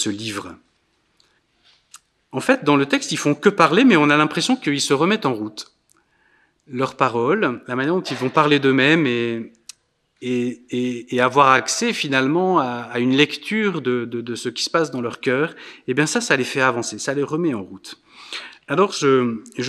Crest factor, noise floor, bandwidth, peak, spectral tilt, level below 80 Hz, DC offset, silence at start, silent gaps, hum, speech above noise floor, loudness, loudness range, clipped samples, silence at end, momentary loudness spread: 20 dB; -65 dBFS; 13.5 kHz; 0 dBFS; -4.5 dB/octave; -70 dBFS; under 0.1%; 0 s; none; none; 46 dB; -19 LUFS; 5 LU; under 0.1%; 0 s; 16 LU